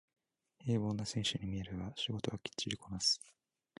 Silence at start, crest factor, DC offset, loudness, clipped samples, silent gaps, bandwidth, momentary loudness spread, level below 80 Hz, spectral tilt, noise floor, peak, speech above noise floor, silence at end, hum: 0.6 s; 20 dB; under 0.1%; -38 LUFS; under 0.1%; none; 11.5 kHz; 9 LU; -60 dBFS; -4 dB/octave; -60 dBFS; -20 dBFS; 22 dB; 0.5 s; none